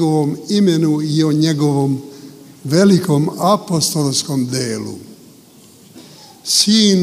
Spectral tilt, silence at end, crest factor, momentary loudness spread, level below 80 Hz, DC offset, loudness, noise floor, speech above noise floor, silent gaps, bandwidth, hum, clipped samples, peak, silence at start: -5 dB/octave; 0 s; 16 dB; 14 LU; -60 dBFS; under 0.1%; -15 LUFS; -44 dBFS; 29 dB; none; 16 kHz; none; under 0.1%; 0 dBFS; 0 s